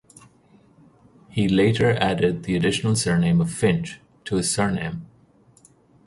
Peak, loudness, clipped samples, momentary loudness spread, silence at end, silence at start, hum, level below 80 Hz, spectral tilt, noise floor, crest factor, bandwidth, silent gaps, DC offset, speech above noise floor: -2 dBFS; -22 LUFS; under 0.1%; 12 LU; 1 s; 1.3 s; none; -48 dBFS; -5.5 dB/octave; -56 dBFS; 20 dB; 11.5 kHz; none; under 0.1%; 35 dB